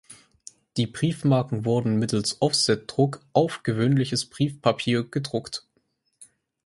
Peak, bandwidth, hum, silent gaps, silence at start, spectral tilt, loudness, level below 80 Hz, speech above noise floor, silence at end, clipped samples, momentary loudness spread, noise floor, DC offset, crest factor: -4 dBFS; 11.5 kHz; none; none; 0.1 s; -5.5 dB/octave; -24 LUFS; -60 dBFS; 47 dB; 0.4 s; under 0.1%; 8 LU; -71 dBFS; under 0.1%; 20 dB